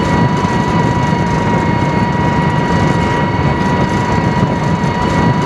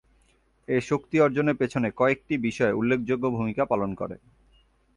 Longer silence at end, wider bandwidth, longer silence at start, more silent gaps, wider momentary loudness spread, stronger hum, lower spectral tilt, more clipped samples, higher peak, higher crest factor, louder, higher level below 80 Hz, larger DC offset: second, 0 s vs 0.8 s; about the same, 11.5 kHz vs 11 kHz; second, 0 s vs 0.7 s; neither; second, 1 LU vs 7 LU; neither; about the same, -7 dB/octave vs -7 dB/octave; neither; first, 0 dBFS vs -10 dBFS; second, 12 dB vs 18 dB; first, -13 LUFS vs -25 LUFS; first, -28 dBFS vs -58 dBFS; neither